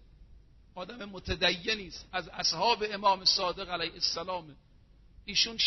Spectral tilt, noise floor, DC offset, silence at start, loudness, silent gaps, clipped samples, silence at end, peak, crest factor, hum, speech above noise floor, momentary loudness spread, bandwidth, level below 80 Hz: 0 dB/octave; -58 dBFS; under 0.1%; 0.2 s; -29 LUFS; none; under 0.1%; 0 s; -12 dBFS; 20 dB; none; 27 dB; 16 LU; 6.2 kHz; -54 dBFS